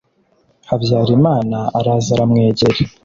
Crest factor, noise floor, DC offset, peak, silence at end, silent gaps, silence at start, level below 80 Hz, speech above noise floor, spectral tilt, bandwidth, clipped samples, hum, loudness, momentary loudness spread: 14 dB; -58 dBFS; under 0.1%; -2 dBFS; 0.15 s; none; 0.7 s; -44 dBFS; 44 dB; -7 dB/octave; 7.6 kHz; under 0.1%; none; -15 LUFS; 6 LU